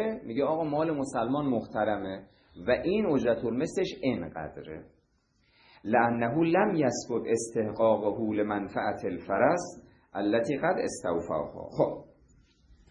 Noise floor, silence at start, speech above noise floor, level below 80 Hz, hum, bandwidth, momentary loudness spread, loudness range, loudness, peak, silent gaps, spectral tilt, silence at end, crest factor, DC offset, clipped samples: -70 dBFS; 0 s; 41 dB; -60 dBFS; none; 11 kHz; 13 LU; 3 LU; -29 LUFS; -10 dBFS; none; -6 dB/octave; 0.85 s; 20 dB; under 0.1%; under 0.1%